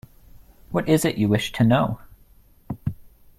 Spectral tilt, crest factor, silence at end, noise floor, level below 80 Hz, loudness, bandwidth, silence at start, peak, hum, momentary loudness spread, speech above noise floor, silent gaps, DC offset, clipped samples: -6 dB/octave; 20 dB; 0.3 s; -53 dBFS; -48 dBFS; -22 LUFS; 15.5 kHz; 0.7 s; -4 dBFS; none; 14 LU; 33 dB; none; under 0.1%; under 0.1%